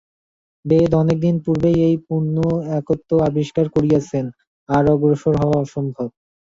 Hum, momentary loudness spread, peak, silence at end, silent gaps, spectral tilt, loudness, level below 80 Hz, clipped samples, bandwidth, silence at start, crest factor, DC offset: none; 9 LU; -4 dBFS; 0.4 s; 4.47-4.67 s; -9 dB/octave; -18 LUFS; -44 dBFS; under 0.1%; 7.6 kHz; 0.65 s; 16 dB; under 0.1%